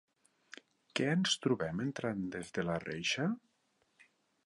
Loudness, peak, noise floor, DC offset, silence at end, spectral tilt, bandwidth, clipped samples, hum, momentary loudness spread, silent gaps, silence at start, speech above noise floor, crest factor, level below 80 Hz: -35 LUFS; -18 dBFS; -77 dBFS; under 0.1%; 1.1 s; -4.5 dB/octave; 11.5 kHz; under 0.1%; none; 22 LU; none; 0.5 s; 42 dB; 20 dB; -68 dBFS